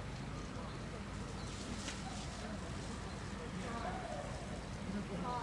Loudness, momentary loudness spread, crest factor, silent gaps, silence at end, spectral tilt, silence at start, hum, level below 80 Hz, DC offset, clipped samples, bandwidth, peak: -44 LUFS; 3 LU; 14 dB; none; 0 s; -5 dB/octave; 0 s; none; -52 dBFS; under 0.1%; under 0.1%; 11.5 kHz; -28 dBFS